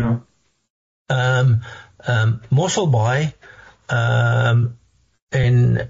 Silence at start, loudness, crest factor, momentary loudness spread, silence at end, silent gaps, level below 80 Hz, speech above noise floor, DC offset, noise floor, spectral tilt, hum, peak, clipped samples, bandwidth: 0 s; -19 LUFS; 10 dB; 9 LU; 0 s; 0.70-1.06 s, 5.22-5.27 s; -44 dBFS; 41 dB; under 0.1%; -58 dBFS; -6 dB/octave; none; -8 dBFS; under 0.1%; 7.8 kHz